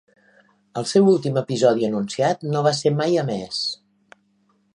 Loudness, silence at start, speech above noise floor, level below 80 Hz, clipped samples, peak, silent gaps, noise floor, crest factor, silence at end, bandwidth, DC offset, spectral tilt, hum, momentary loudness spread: -21 LUFS; 0.75 s; 44 dB; -68 dBFS; under 0.1%; -4 dBFS; none; -64 dBFS; 18 dB; 1 s; 11 kHz; under 0.1%; -5.5 dB/octave; none; 10 LU